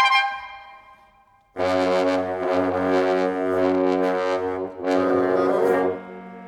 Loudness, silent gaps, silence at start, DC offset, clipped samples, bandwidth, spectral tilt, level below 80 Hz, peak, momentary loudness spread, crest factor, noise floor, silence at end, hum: -22 LUFS; none; 0 s; under 0.1%; under 0.1%; 13.5 kHz; -5.5 dB/octave; -62 dBFS; -4 dBFS; 11 LU; 18 dB; -57 dBFS; 0 s; none